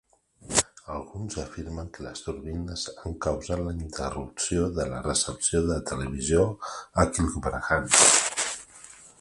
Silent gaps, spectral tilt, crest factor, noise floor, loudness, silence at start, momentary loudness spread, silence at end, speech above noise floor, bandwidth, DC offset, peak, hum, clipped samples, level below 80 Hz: none; -3 dB/octave; 26 dB; -49 dBFS; -25 LUFS; 0.45 s; 16 LU; 0.1 s; 22 dB; 11.5 kHz; under 0.1%; -2 dBFS; none; under 0.1%; -40 dBFS